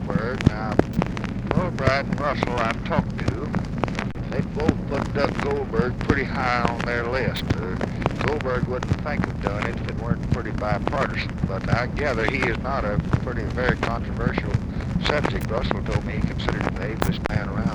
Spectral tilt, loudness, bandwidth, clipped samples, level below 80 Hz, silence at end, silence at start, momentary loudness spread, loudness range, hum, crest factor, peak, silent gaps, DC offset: -7 dB/octave; -24 LUFS; over 20 kHz; under 0.1%; -34 dBFS; 0 s; 0 s; 5 LU; 2 LU; none; 22 dB; 0 dBFS; none; under 0.1%